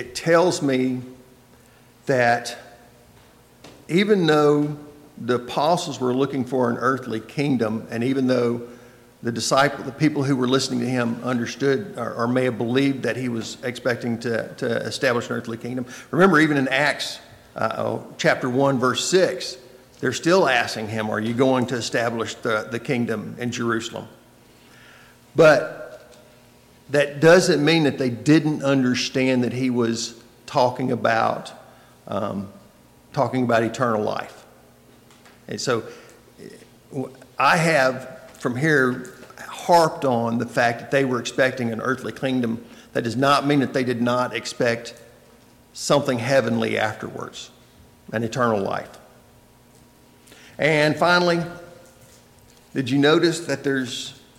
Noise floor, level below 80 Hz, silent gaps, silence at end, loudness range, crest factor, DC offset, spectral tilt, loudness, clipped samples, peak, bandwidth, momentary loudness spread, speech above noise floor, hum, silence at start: -52 dBFS; -62 dBFS; none; 0.25 s; 6 LU; 16 dB; under 0.1%; -5 dB/octave; -21 LUFS; under 0.1%; -6 dBFS; 16.5 kHz; 15 LU; 31 dB; none; 0 s